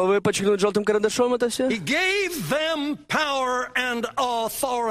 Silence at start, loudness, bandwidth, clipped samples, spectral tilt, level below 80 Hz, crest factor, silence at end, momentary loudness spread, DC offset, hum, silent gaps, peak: 0 s; -23 LUFS; 15 kHz; under 0.1%; -3.5 dB/octave; -56 dBFS; 16 dB; 0 s; 4 LU; under 0.1%; none; none; -6 dBFS